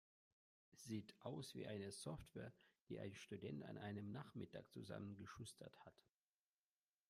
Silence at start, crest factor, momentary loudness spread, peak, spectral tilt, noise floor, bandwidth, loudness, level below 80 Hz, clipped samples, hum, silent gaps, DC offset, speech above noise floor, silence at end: 0.7 s; 20 dB; 8 LU; -36 dBFS; -5.5 dB/octave; under -90 dBFS; 15 kHz; -55 LUFS; -80 dBFS; under 0.1%; none; 2.82-2.86 s; under 0.1%; over 36 dB; 1.15 s